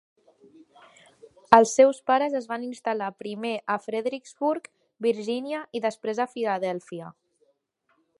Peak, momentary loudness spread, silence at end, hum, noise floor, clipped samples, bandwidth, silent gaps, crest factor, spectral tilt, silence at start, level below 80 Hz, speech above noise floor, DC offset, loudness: 0 dBFS; 14 LU; 1.1 s; none; -71 dBFS; under 0.1%; 11.5 kHz; none; 26 dB; -4 dB/octave; 1.5 s; -70 dBFS; 46 dB; under 0.1%; -25 LUFS